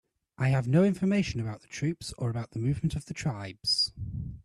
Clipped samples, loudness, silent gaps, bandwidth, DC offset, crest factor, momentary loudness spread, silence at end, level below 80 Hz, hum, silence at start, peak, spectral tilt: under 0.1%; -29 LUFS; none; 12 kHz; under 0.1%; 16 dB; 10 LU; 0.05 s; -50 dBFS; none; 0.4 s; -14 dBFS; -6 dB/octave